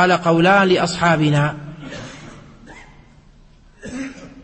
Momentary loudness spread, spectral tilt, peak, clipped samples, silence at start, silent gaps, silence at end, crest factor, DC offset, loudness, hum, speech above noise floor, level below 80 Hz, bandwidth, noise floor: 21 LU; -5.5 dB/octave; -2 dBFS; under 0.1%; 0 s; none; 0.05 s; 16 dB; under 0.1%; -15 LUFS; none; 33 dB; -48 dBFS; 8.8 kHz; -48 dBFS